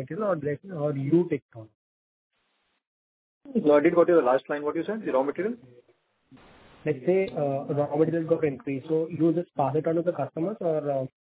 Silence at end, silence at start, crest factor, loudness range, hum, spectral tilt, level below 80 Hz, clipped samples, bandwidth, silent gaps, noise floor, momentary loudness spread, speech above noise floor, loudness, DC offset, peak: 0.15 s; 0 s; 20 dB; 5 LU; none; -12 dB/octave; -70 dBFS; under 0.1%; 4 kHz; 1.42-1.49 s, 1.75-2.30 s, 2.87-3.41 s; -74 dBFS; 11 LU; 48 dB; -26 LUFS; under 0.1%; -8 dBFS